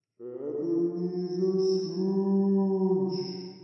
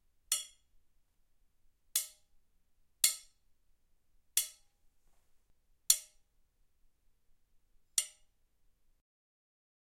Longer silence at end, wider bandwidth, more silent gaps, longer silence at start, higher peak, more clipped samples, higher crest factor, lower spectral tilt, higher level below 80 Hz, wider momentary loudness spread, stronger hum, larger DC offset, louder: second, 0 s vs 1.9 s; second, 6.4 kHz vs 16.5 kHz; neither; about the same, 0.2 s vs 0.3 s; second, -16 dBFS vs -8 dBFS; neither; second, 12 dB vs 34 dB; first, -8.5 dB/octave vs 4.5 dB/octave; second, -84 dBFS vs -74 dBFS; second, 10 LU vs 15 LU; neither; neither; first, -28 LUFS vs -33 LUFS